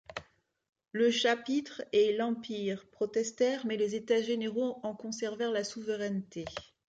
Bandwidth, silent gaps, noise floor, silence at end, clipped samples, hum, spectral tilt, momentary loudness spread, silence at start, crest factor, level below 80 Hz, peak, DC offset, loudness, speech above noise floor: 9.2 kHz; 0.69-0.73 s; -64 dBFS; 0.35 s; under 0.1%; none; -4 dB/octave; 13 LU; 0.1 s; 18 dB; -70 dBFS; -16 dBFS; under 0.1%; -32 LUFS; 32 dB